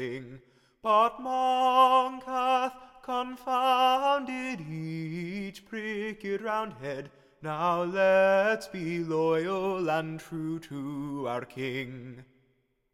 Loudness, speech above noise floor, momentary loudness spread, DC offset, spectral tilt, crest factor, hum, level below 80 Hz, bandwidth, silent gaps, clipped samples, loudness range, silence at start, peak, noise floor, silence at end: -28 LUFS; 43 dB; 15 LU; under 0.1%; -5.5 dB/octave; 18 dB; none; -66 dBFS; 15 kHz; none; under 0.1%; 8 LU; 0 s; -10 dBFS; -72 dBFS; 0.7 s